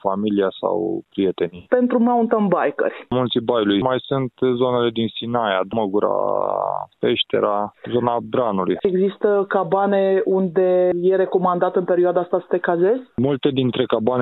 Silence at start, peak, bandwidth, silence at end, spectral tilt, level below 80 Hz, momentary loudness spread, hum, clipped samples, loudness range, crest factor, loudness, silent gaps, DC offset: 0.05 s; -2 dBFS; 4.1 kHz; 0 s; -10 dB/octave; -58 dBFS; 5 LU; none; under 0.1%; 3 LU; 16 dB; -20 LUFS; none; under 0.1%